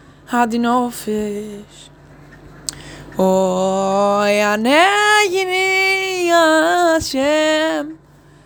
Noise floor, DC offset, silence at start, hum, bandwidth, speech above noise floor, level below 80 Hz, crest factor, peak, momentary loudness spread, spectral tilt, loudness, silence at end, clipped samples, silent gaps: -42 dBFS; under 0.1%; 0.3 s; none; over 20 kHz; 27 dB; -48 dBFS; 16 dB; 0 dBFS; 16 LU; -3.5 dB/octave; -15 LUFS; 0.5 s; under 0.1%; none